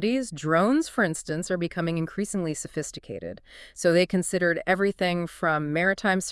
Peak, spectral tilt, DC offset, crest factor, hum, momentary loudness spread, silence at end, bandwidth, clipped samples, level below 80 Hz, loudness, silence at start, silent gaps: -8 dBFS; -5 dB/octave; under 0.1%; 18 dB; none; 13 LU; 0 s; 12 kHz; under 0.1%; -56 dBFS; -25 LUFS; 0 s; none